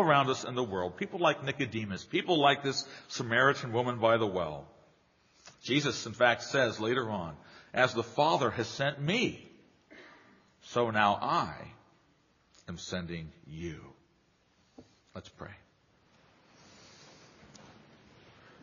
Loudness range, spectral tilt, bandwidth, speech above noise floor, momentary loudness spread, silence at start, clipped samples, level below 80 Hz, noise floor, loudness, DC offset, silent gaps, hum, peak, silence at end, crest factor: 15 LU; -3 dB/octave; 7.2 kHz; 39 dB; 20 LU; 0 s; under 0.1%; -66 dBFS; -69 dBFS; -30 LUFS; under 0.1%; none; none; -10 dBFS; 0.9 s; 24 dB